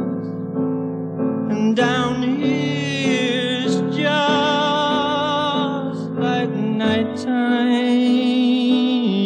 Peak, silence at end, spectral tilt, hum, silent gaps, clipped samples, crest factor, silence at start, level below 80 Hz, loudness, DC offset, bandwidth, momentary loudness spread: -6 dBFS; 0 s; -5.5 dB/octave; none; none; under 0.1%; 14 dB; 0 s; -58 dBFS; -19 LUFS; under 0.1%; 9.2 kHz; 6 LU